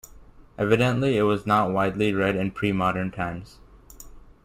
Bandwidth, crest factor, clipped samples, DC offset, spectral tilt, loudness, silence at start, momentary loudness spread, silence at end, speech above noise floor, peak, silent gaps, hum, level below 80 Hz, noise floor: 16 kHz; 20 dB; under 0.1%; under 0.1%; -7 dB/octave; -24 LUFS; 0.1 s; 8 LU; 0.25 s; 25 dB; -6 dBFS; none; none; -48 dBFS; -48 dBFS